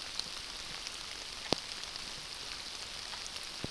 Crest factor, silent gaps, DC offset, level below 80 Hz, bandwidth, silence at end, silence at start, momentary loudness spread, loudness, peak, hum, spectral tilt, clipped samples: 36 dB; none; under 0.1%; -58 dBFS; 11 kHz; 0 s; 0 s; 5 LU; -39 LUFS; -6 dBFS; none; -1.5 dB/octave; under 0.1%